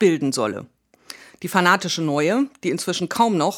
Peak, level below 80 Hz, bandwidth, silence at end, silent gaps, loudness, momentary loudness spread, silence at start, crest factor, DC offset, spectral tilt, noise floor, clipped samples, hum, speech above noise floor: 0 dBFS; -70 dBFS; 19 kHz; 0 s; none; -21 LUFS; 18 LU; 0 s; 20 dB; under 0.1%; -4.5 dB/octave; -44 dBFS; under 0.1%; none; 24 dB